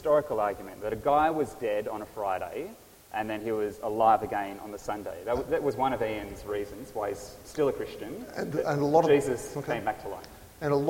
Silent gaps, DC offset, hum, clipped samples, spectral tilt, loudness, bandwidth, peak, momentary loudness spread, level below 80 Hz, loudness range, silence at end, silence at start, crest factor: none; under 0.1%; none; under 0.1%; -6 dB/octave; -30 LUFS; 16.5 kHz; -8 dBFS; 14 LU; -56 dBFS; 3 LU; 0 s; 0 s; 20 dB